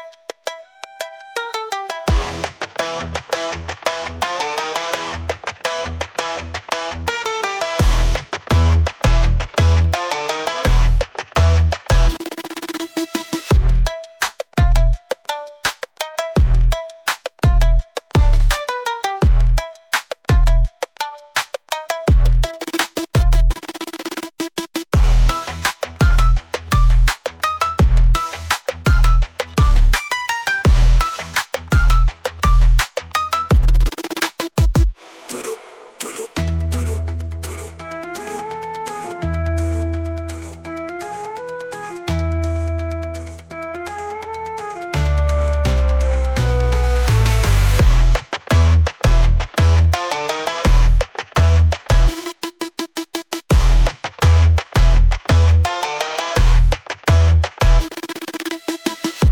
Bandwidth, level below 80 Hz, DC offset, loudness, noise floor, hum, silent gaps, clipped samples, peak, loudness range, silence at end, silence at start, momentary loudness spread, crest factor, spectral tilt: 17.5 kHz; -18 dBFS; under 0.1%; -19 LUFS; -37 dBFS; none; none; under 0.1%; -4 dBFS; 8 LU; 0 s; 0 s; 12 LU; 12 dB; -5 dB/octave